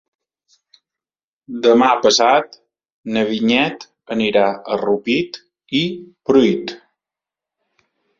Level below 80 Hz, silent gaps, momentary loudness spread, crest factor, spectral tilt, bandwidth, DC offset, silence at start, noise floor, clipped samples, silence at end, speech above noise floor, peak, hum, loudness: -60 dBFS; 2.92-3.04 s; 18 LU; 18 dB; -4 dB/octave; 7.8 kHz; under 0.1%; 1.5 s; under -90 dBFS; under 0.1%; 1.4 s; over 74 dB; -2 dBFS; none; -17 LUFS